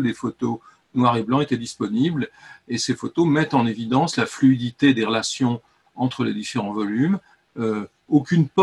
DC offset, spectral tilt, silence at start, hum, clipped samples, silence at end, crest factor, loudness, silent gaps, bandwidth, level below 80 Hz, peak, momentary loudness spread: under 0.1%; -6 dB/octave; 0 s; none; under 0.1%; 0 s; 16 dB; -22 LUFS; none; 11.5 kHz; -62 dBFS; -4 dBFS; 9 LU